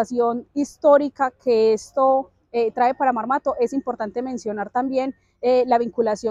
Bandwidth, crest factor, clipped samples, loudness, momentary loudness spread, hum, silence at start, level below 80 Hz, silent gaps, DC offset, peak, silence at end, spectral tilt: 11 kHz; 16 dB; under 0.1%; -21 LUFS; 10 LU; none; 0 s; -62 dBFS; none; under 0.1%; -4 dBFS; 0 s; -5 dB/octave